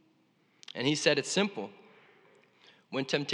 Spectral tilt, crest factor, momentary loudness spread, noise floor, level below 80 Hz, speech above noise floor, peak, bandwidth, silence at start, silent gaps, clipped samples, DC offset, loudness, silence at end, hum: -3.5 dB/octave; 26 dB; 16 LU; -69 dBFS; under -90 dBFS; 39 dB; -8 dBFS; 11.5 kHz; 0.75 s; none; under 0.1%; under 0.1%; -30 LUFS; 0 s; none